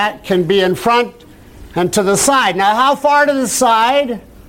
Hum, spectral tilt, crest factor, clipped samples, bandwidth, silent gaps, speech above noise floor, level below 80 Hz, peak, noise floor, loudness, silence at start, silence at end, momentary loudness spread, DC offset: none; -3 dB/octave; 12 dB; under 0.1%; 16.5 kHz; none; 24 dB; -44 dBFS; -2 dBFS; -37 dBFS; -13 LUFS; 0 s; 0.3 s; 6 LU; under 0.1%